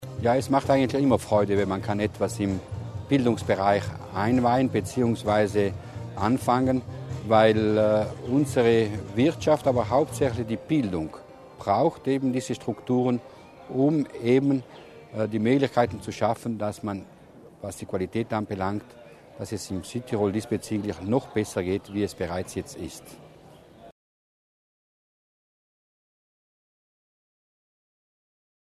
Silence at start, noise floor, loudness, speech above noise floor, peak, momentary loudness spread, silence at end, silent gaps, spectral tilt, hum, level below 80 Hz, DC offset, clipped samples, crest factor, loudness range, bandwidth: 0 s; -50 dBFS; -25 LUFS; 26 dB; -6 dBFS; 13 LU; 4.85 s; none; -6.5 dB/octave; none; -56 dBFS; under 0.1%; under 0.1%; 20 dB; 9 LU; 13.5 kHz